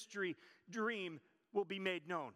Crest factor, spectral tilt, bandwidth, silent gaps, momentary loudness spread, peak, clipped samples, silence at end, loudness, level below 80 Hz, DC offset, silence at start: 20 dB; -4.5 dB/octave; 12.5 kHz; none; 9 LU; -24 dBFS; under 0.1%; 0.05 s; -43 LUFS; under -90 dBFS; under 0.1%; 0 s